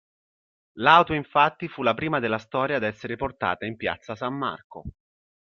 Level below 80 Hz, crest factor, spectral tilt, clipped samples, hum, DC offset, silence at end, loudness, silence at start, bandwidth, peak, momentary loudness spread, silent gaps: -56 dBFS; 24 dB; -6.5 dB/octave; under 0.1%; none; under 0.1%; 0.65 s; -24 LUFS; 0.75 s; 7 kHz; -2 dBFS; 14 LU; 4.64-4.70 s